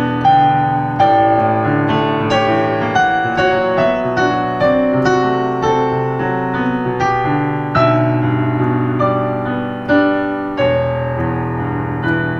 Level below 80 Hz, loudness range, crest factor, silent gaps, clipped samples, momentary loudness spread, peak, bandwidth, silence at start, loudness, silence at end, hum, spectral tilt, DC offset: -42 dBFS; 2 LU; 14 dB; none; under 0.1%; 6 LU; -2 dBFS; 7.4 kHz; 0 s; -15 LUFS; 0 s; none; -7.5 dB/octave; under 0.1%